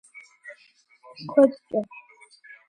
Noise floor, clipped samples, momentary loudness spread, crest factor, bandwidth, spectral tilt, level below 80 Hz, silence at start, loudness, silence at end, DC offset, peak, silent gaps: -59 dBFS; under 0.1%; 25 LU; 22 dB; 10 kHz; -7 dB/octave; -76 dBFS; 0.5 s; -23 LUFS; 0.85 s; under 0.1%; -6 dBFS; none